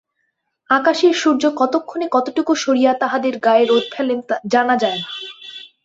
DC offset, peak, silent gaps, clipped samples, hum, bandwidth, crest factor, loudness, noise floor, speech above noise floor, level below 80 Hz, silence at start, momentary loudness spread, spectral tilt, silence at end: under 0.1%; -2 dBFS; none; under 0.1%; none; 8 kHz; 16 dB; -17 LUFS; -71 dBFS; 54 dB; -66 dBFS; 0.7 s; 10 LU; -3.5 dB/octave; 0.2 s